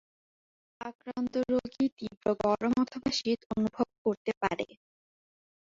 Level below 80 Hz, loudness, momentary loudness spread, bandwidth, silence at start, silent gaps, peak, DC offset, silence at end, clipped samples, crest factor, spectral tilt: -62 dBFS; -31 LUFS; 11 LU; 7.6 kHz; 0.8 s; 0.95-0.99 s, 1.92-1.97 s, 2.17-2.21 s, 3.46-3.50 s, 3.98-4.05 s, 4.17-4.25 s, 4.37-4.41 s; -12 dBFS; under 0.1%; 0.95 s; under 0.1%; 20 dB; -5 dB/octave